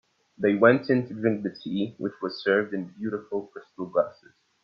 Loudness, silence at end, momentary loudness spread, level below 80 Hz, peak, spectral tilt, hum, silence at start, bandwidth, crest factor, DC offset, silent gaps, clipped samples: -26 LUFS; 0.5 s; 13 LU; -72 dBFS; -4 dBFS; -8.5 dB/octave; none; 0.4 s; 6.6 kHz; 22 dB; under 0.1%; none; under 0.1%